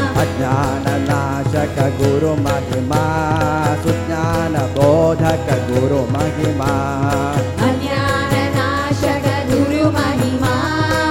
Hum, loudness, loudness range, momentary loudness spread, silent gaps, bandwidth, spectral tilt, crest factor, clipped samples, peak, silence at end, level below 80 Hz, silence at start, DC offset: none; -17 LUFS; 1 LU; 3 LU; none; 16.5 kHz; -6.5 dB/octave; 16 dB; under 0.1%; 0 dBFS; 0 s; -36 dBFS; 0 s; under 0.1%